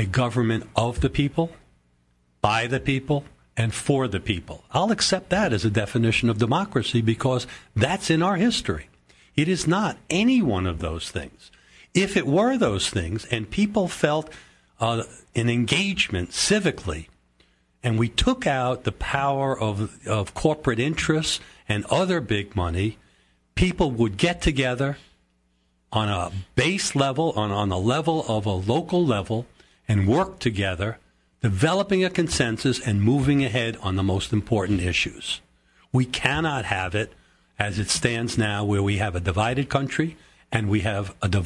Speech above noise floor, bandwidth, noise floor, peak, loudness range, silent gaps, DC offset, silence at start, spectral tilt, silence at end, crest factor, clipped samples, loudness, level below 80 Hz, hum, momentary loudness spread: 44 dB; 12 kHz; -67 dBFS; -2 dBFS; 3 LU; none; under 0.1%; 0 s; -5 dB/octave; 0 s; 22 dB; under 0.1%; -24 LUFS; -44 dBFS; none; 8 LU